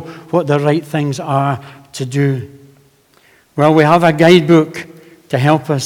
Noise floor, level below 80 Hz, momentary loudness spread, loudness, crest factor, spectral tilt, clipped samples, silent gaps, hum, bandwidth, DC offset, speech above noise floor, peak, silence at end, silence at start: -51 dBFS; -56 dBFS; 17 LU; -13 LUFS; 14 dB; -6.5 dB/octave; 0.2%; none; none; 16 kHz; under 0.1%; 38 dB; 0 dBFS; 0 s; 0 s